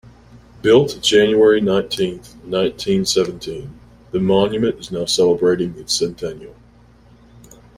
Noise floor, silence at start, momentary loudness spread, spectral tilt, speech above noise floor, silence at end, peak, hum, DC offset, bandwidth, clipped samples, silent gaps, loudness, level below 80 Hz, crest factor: -48 dBFS; 0.35 s; 16 LU; -4.5 dB/octave; 31 dB; 1.25 s; -2 dBFS; none; under 0.1%; 15.5 kHz; under 0.1%; none; -17 LUFS; -48 dBFS; 16 dB